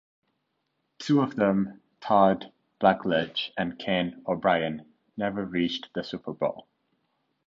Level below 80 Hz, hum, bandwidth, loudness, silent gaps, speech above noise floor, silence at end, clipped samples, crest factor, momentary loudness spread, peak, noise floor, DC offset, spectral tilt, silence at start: -62 dBFS; none; 7.6 kHz; -27 LUFS; none; 51 dB; 0.85 s; under 0.1%; 22 dB; 14 LU; -6 dBFS; -77 dBFS; under 0.1%; -6.5 dB/octave; 1 s